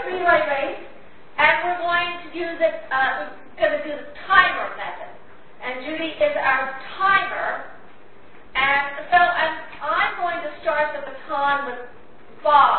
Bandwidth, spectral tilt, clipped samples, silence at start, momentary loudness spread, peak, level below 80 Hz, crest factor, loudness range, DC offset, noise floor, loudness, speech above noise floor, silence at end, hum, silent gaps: 4.5 kHz; -7.5 dB/octave; under 0.1%; 0 s; 15 LU; 0 dBFS; -56 dBFS; 22 dB; 2 LU; 1%; -49 dBFS; -21 LUFS; 28 dB; 0 s; none; none